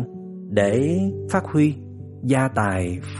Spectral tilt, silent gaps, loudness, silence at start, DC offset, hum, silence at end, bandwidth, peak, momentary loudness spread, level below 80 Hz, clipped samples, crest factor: -7 dB/octave; none; -22 LUFS; 0 s; under 0.1%; none; 0 s; 11.5 kHz; -4 dBFS; 14 LU; -52 dBFS; under 0.1%; 18 dB